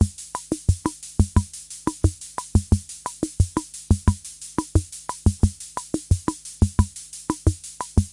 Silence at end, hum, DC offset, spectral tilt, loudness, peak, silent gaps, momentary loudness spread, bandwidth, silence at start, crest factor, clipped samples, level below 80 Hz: 0.05 s; none; under 0.1%; -6 dB/octave; -25 LUFS; -6 dBFS; none; 10 LU; 11.5 kHz; 0 s; 18 dB; under 0.1%; -30 dBFS